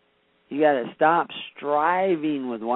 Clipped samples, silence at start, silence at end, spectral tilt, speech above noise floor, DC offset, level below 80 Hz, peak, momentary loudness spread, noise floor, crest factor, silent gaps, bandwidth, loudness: under 0.1%; 0.5 s; 0 s; -10 dB/octave; 43 dB; under 0.1%; -70 dBFS; -6 dBFS; 11 LU; -65 dBFS; 18 dB; none; 4.1 kHz; -23 LUFS